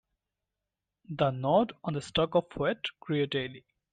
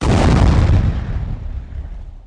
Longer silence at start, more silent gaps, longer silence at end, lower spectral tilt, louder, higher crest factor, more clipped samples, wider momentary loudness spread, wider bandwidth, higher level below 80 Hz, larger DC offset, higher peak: first, 1.1 s vs 0 s; neither; first, 0.35 s vs 0 s; about the same, -6.5 dB/octave vs -7 dB/octave; second, -30 LUFS vs -16 LUFS; about the same, 18 dB vs 14 dB; neither; second, 9 LU vs 19 LU; second, 9.4 kHz vs 10.5 kHz; second, -60 dBFS vs -18 dBFS; neither; second, -14 dBFS vs -2 dBFS